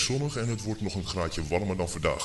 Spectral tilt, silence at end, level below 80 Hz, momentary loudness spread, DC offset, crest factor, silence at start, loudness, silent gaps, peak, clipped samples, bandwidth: -4.5 dB/octave; 0 s; -44 dBFS; 3 LU; under 0.1%; 18 dB; 0 s; -30 LUFS; none; -12 dBFS; under 0.1%; 11.5 kHz